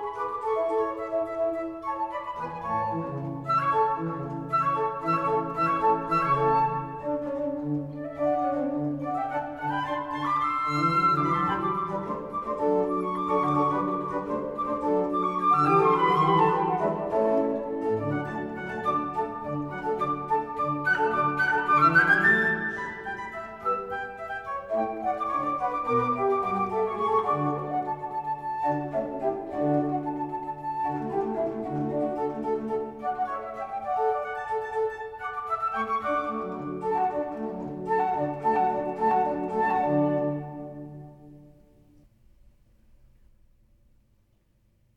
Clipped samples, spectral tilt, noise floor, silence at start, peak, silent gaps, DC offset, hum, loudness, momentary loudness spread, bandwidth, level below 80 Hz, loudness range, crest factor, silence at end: under 0.1%; -7.5 dB/octave; -66 dBFS; 0 s; -8 dBFS; none; under 0.1%; none; -27 LUFS; 10 LU; 12 kHz; -58 dBFS; 6 LU; 18 dB; 3.5 s